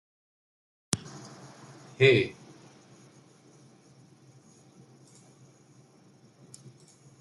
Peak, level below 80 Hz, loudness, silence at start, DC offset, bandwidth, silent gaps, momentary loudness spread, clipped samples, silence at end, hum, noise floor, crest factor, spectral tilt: 0 dBFS; -70 dBFS; -26 LUFS; 0.95 s; under 0.1%; 11.5 kHz; none; 29 LU; under 0.1%; 4.9 s; none; -59 dBFS; 34 dB; -4.5 dB/octave